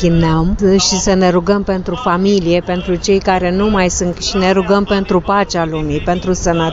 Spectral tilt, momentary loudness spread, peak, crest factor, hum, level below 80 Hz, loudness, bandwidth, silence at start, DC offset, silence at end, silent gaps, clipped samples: -5 dB/octave; 5 LU; -2 dBFS; 12 dB; none; -28 dBFS; -14 LUFS; 8 kHz; 0 s; under 0.1%; 0 s; none; under 0.1%